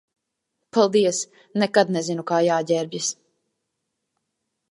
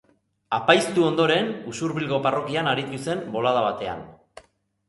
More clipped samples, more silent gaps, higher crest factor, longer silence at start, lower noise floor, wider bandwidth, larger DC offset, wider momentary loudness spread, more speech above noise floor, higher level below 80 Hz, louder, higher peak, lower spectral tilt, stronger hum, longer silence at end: neither; neither; about the same, 22 dB vs 22 dB; first, 0.75 s vs 0.5 s; first, -79 dBFS vs -57 dBFS; about the same, 11.5 kHz vs 11.5 kHz; neither; about the same, 9 LU vs 10 LU; first, 58 dB vs 34 dB; second, -76 dBFS vs -62 dBFS; about the same, -22 LUFS vs -23 LUFS; about the same, -2 dBFS vs -2 dBFS; about the same, -4 dB/octave vs -5 dB/octave; neither; first, 1.6 s vs 0.75 s